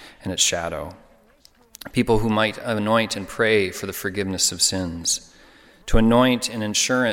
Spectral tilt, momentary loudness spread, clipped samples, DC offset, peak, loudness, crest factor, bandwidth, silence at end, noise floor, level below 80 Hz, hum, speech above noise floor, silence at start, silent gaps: -3 dB/octave; 11 LU; under 0.1%; under 0.1%; -4 dBFS; -21 LUFS; 18 dB; 17.5 kHz; 0 s; -55 dBFS; -36 dBFS; none; 34 dB; 0 s; none